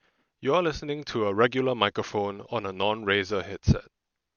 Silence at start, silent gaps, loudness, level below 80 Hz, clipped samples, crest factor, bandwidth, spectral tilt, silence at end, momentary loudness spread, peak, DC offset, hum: 0.4 s; none; -27 LUFS; -46 dBFS; under 0.1%; 22 dB; 7 kHz; -6 dB/octave; 0.55 s; 8 LU; -6 dBFS; under 0.1%; none